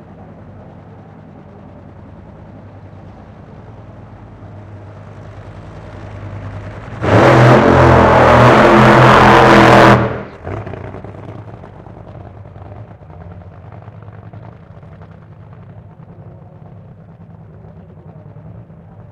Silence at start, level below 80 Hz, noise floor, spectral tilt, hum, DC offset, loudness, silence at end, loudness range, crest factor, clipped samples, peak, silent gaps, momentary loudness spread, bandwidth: 4.4 s; -34 dBFS; -37 dBFS; -7 dB/octave; none; under 0.1%; -7 LUFS; 4.7 s; 25 LU; 14 dB; 0.1%; 0 dBFS; none; 28 LU; 12 kHz